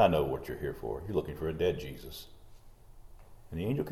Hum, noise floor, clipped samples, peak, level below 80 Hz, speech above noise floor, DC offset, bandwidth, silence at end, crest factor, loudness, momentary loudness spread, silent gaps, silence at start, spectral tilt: none; -52 dBFS; under 0.1%; -10 dBFS; -50 dBFS; 20 dB; under 0.1%; 16.5 kHz; 0 s; 24 dB; -34 LUFS; 14 LU; none; 0 s; -7 dB/octave